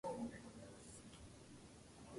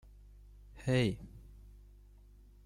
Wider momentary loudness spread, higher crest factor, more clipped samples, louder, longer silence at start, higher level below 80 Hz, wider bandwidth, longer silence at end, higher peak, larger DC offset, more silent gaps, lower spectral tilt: second, 11 LU vs 26 LU; about the same, 18 dB vs 20 dB; neither; second, -55 LUFS vs -35 LUFS; second, 0.05 s vs 0.75 s; second, -70 dBFS vs -54 dBFS; about the same, 11.5 kHz vs 12.5 kHz; second, 0 s vs 1.2 s; second, -36 dBFS vs -18 dBFS; neither; neither; second, -5 dB/octave vs -6.5 dB/octave